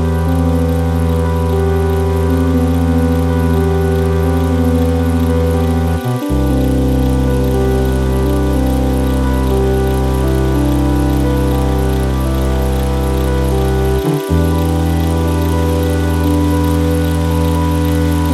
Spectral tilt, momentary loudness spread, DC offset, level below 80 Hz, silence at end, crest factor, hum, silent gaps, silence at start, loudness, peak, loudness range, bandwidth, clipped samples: -7.5 dB/octave; 2 LU; under 0.1%; -18 dBFS; 0 s; 10 dB; none; none; 0 s; -14 LUFS; -2 dBFS; 1 LU; 14 kHz; under 0.1%